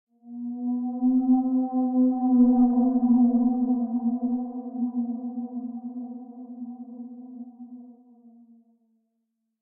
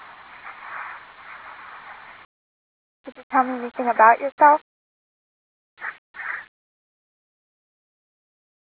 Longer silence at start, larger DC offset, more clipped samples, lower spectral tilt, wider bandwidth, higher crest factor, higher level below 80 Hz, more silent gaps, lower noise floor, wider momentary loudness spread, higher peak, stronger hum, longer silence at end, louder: second, 0.25 s vs 0.45 s; neither; neither; first, -13.5 dB/octave vs -7 dB/octave; second, 1.3 kHz vs 4 kHz; second, 16 dB vs 24 dB; first, -64 dBFS vs -74 dBFS; second, none vs 2.25-3.04 s, 3.23-3.30 s, 4.32-4.38 s, 4.61-5.77 s, 5.98-6.14 s; first, -78 dBFS vs -42 dBFS; second, 21 LU vs 25 LU; second, -10 dBFS vs -2 dBFS; neither; second, 1.7 s vs 2.3 s; second, -24 LUFS vs -19 LUFS